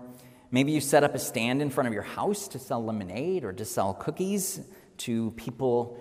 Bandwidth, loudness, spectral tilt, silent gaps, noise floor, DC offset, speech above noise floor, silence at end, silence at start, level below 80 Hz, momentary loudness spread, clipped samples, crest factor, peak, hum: 16 kHz; -29 LUFS; -5 dB/octave; none; -48 dBFS; under 0.1%; 20 dB; 0 s; 0 s; -66 dBFS; 10 LU; under 0.1%; 20 dB; -10 dBFS; none